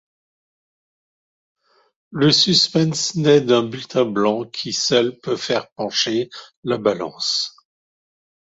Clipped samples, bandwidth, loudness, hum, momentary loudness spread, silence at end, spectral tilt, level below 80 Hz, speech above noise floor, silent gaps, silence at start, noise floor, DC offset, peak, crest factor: under 0.1%; 8 kHz; -18 LUFS; none; 11 LU; 1 s; -4 dB/octave; -62 dBFS; over 71 dB; 5.72-5.76 s, 6.56-6.63 s; 2.1 s; under -90 dBFS; under 0.1%; -2 dBFS; 18 dB